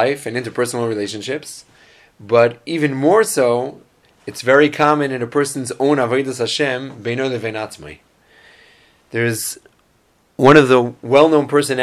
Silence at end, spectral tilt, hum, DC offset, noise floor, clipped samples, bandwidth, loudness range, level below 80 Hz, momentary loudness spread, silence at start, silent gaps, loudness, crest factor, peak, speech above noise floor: 0 s; -5 dB/octave; none; under 0.1%; -58 dBFS; under 0.1%; 15 kHz; 8 LU; -58 dBFS; 15 LU; 0 s; none; -16 LUFS; 18 dB; 0 dBFS; 42 dB